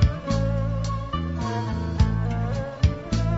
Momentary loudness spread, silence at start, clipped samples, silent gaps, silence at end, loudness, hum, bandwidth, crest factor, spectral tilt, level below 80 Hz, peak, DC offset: 5 LU; 0 s; under 0.1%; none; 0 s; -26 LUFS; none; 8 kHz; 16 dB; -7 dB/octave; -30 dBFS; -6 dBFS; 0.1%